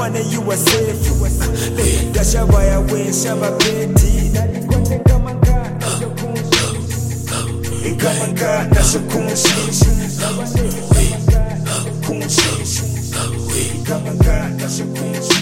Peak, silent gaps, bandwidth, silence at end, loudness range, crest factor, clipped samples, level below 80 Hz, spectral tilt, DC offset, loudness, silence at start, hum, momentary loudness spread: 0 dBFS; none; 16.5 kHz; 0 s; 3 LU; 16 dB; under 0.1%; -20 dBFS; -4.5 dB/octave; 0.9%; -16 LUFS; 0 s; none; 7 LU